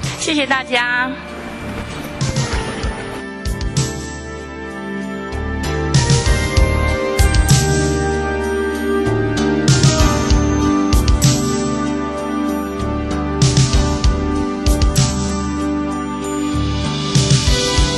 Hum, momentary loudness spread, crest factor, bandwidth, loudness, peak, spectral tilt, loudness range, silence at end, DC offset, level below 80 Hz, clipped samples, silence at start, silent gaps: none; 12 LU; 14 dB; 13 kHz; -17 LUFS; -2 dBFS; -4.5 dB/octave; 8 LU; 0 s; under 0.1%; -22 dBFS; under 0.1%; 0 s; none